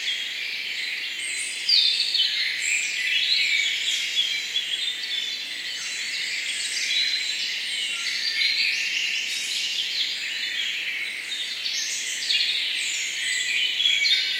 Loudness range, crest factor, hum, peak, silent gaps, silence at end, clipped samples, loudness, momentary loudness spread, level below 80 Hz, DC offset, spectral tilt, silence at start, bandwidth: 4 LU; 18 dB; none; -6 dBFS; none; 0 s; under 0.1%; -23 LUFS; 8 LU; -78 dBFS; under 0.1%; 3.5 dB/octave; 0 s; 16 kHz